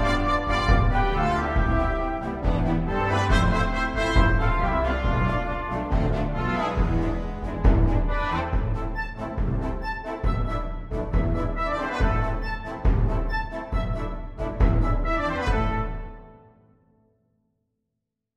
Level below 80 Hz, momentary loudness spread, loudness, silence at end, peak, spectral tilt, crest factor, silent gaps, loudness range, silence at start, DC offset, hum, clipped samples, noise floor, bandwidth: -26 dBFS; 10 LU; -25 LUFS; 2.05 s; -6 dBFS; -7 dB/octave; 18 dB; none; 5 LU; 0 s; under 0.1%; none; under 0.1%; -82 dBFS; 8.4 kHz